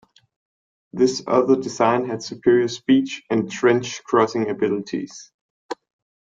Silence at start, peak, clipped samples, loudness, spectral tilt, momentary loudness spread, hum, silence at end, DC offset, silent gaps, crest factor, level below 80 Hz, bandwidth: 0.95 s; -2 dBFS; under 0.1%; -20 LUFS; -5 dB/octave; 17 LU; none; 0.55 s; under 0.1%; 5.34-5.69 s; 18 dB; -64 dBFS; 7.8 kHz